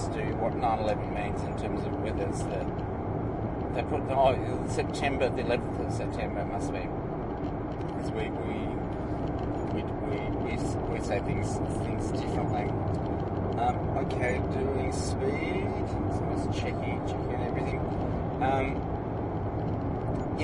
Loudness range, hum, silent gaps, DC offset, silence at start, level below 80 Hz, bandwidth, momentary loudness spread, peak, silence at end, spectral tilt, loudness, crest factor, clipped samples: 3 LU; none; none; under 0.1%; 0 s; -42 dBFS; 11 kHz; 5 LU; -12 dBFS; 0 s; -7 dB/octave; -31 LUFS; 18 dB; under 0.1%